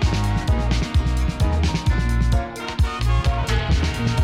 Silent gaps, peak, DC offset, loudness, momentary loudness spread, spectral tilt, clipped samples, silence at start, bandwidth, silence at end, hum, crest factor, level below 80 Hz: none; -8 dBFS; under 0.1%; -22 LUFS; 3 LU; -6 dB/octave; under 0.1%; 0 s; 13 kHz; 0 s; none; 12 dB; -22 dBFS